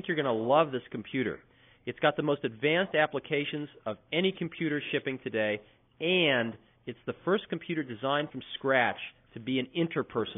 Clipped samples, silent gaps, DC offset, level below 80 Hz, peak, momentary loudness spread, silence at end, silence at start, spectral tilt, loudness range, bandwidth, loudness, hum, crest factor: under 0.1%; none; under 0.1%; -70 dBFS; -10 dBFS; 14 LU; 0 s; 0 s; -2 dB/octave; 2 LU; 3.8 kHz; -30 LUFS; none; 20 dB